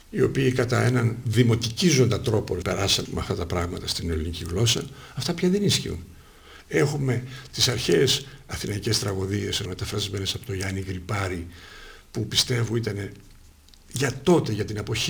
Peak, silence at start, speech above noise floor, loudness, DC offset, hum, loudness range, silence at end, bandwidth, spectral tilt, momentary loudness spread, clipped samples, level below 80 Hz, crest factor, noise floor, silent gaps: -6 dBFS; 0.1 s; 26 dB; -24 LUFS; under 0.1%; none; 5 LU; 0 s; over 20 kHz; -4.5 dB/octave; 12 LU; under 0.1%; -44 dBFS; 20 dB; -51 dBFS; none